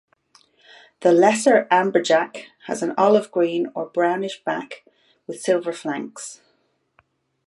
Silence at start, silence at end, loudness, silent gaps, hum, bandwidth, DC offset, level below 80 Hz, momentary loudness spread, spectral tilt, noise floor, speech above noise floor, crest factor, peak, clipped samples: 1 s; 1.15 s; -20 LUFS; none; none; 11.5 kHz; under 0.1%; -74 dBFS; 19 LU; -4.5 dB/octave; -67 dBFS; 47 dB; 18 dB; -2 dBFS; under 0.1%